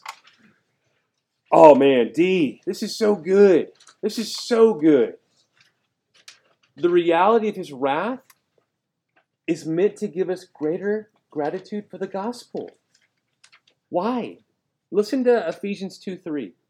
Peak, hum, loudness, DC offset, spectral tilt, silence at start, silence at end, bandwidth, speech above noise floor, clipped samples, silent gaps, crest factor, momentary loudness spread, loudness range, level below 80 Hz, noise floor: 0 dBFS; none; -20 LUFS; under 0.1%; -6 dB/octave; 0.05 s; 0.2 s; 15 kHz; 59 dB; under 0.1%; none; 22 dB; 18 LU; 12 LU; -74 dBFS; -78 dBFS